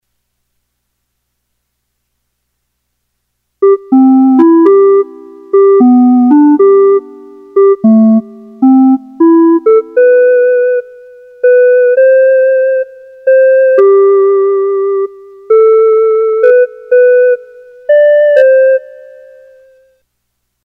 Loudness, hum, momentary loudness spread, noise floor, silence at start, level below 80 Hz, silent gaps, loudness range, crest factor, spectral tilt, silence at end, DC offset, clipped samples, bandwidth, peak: -7 LUFS; 60 Hz at -50 dBFS; 7 LU; -67 dBFS; 3.6 s; -66 dBFS; none; 3 LU; 8 dB; -9.5 dB/octave; 1.85 s; under 0.1%; under 0.1%; 3.1 kHz; 0 dBFS